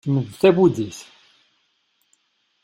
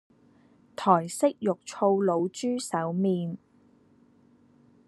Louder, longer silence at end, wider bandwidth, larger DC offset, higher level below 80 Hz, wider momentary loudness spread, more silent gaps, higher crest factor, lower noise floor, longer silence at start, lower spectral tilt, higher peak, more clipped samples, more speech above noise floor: first, -19 LUFS vs -27 LUFS; about the same, 1.6 s vs 1.5 s; first, 15.5 kHz vs 12.5 kHz; neither; first, -60 dBFS vs -76 dBFS; first, 17 LU vs 8 LU; neither; about the same, 20 dB vs 22 dB; first, -68 dBFS vs -61 dBFS; second, 0.05 s vs 0.8 s; about the same, -7 dB/octave vs -6 dB/octave; first, -2 dBFS vs -6 dBFS; neither; first, 49 dB vs 35 dB